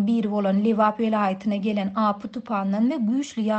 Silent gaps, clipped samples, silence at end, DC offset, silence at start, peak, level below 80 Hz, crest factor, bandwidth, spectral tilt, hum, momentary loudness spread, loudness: none; under 0.1%; 0 s; under 0.1%; 0 s; -8 dBFS; -66 dBFS; 14 dB; 8.2 kHz; -7 dB/octave; none; 5 LU; -23 LUFS